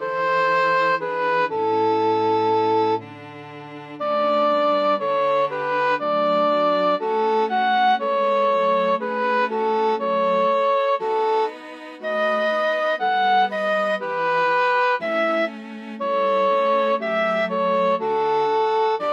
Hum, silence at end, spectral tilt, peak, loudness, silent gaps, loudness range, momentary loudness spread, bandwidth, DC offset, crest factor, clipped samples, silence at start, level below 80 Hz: none; 0 s; -5.5 dB/octave; -10 dBFS; -20 LUFS; none; 2 LU; 6 LU; 7.8 kHz; under 0.1%; 12 dB; under 0.1%; 0 s; -74 dBFS